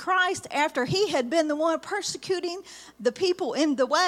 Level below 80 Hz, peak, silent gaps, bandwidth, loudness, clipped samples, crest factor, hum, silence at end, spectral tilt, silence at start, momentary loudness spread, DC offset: -68 dBFS; -10 dBFS; none; 15.5 kHz; -26 LUFS; under 0.1%; 16 dB; none; 0 s; -3.5 dB/octave; 0 s; 6 LU; under 0.1%